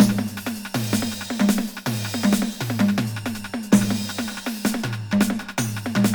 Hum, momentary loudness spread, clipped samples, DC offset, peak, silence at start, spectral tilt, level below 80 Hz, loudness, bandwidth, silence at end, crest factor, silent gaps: none; 8 LU; under 0.1%; under 0.1%; -4 dBFS; 0 s; -5 dB/octave; -52 dBFS; -23 LUFS; over 20 kHz; 0 s; 20 dB; none